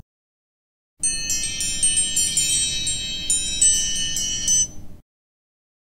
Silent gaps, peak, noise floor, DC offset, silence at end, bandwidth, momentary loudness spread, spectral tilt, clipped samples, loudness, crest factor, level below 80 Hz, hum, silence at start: none; -6 dBFS; under -90 dBFS; under 0.1%; 0.95 s; 17.5 kHz; 7 LU; 1 dB/octave; under 0.1%; -19 LUFS; 18 dB; -42 dBFS; none; 1 s